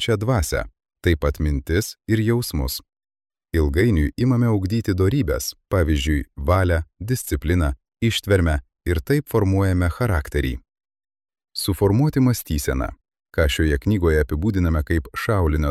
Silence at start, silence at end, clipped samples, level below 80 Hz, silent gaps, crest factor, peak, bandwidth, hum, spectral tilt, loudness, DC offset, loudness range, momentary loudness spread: 0 s; 0 s; under 0.1%; -28 dBFS; none; 16 dB; -6 dBFS; 15 kHz; none; -6 dB/octave; -21 LUFS; under 0.1%; 2 LU; 7 LU